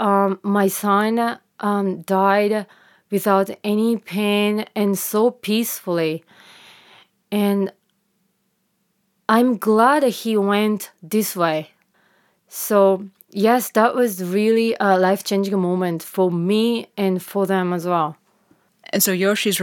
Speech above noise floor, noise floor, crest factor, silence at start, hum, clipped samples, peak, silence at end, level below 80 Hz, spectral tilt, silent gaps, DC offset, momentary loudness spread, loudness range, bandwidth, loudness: 50 dB; -69 dBFS; 18 dB; 0 s; none; under 0.1%; -2 dBFS; 0 s; -78 dBFS; -5 dB/octave; none; under 0.1%; 8 LU; 5 LU; 18 kHz; -19 LUFS